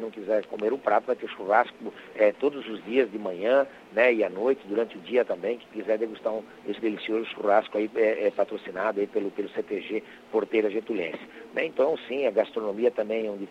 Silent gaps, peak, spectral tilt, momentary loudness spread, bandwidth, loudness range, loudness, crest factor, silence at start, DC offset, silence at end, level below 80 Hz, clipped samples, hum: none; -8 dBFS; -6 dB/octave; 8 LU; 8.2 kHz; 3 LU; -27 LUFS; 20 dB; 0 s; under 0.1%; 0 s; -74 dBFS; under 0.1%; none